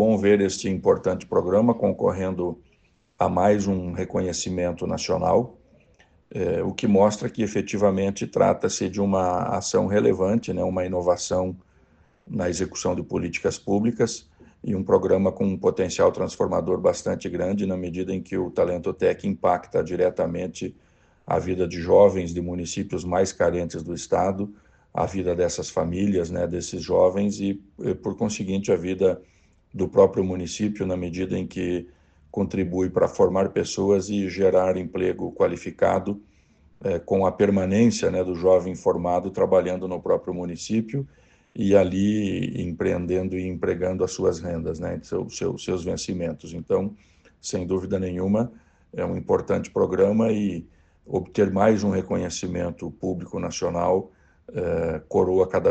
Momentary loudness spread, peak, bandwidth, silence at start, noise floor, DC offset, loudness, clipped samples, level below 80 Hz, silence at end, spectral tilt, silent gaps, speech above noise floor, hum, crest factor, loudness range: 10 LU; -4 dBFS; 8.8 kHz; 0 s; -63 dBFS; under 0.1%; -24 LUFS; under 0.1%; -52 dBFS; 0 s; -6 dB/octave; none; 39 dB; none; 20 dB; 4 LU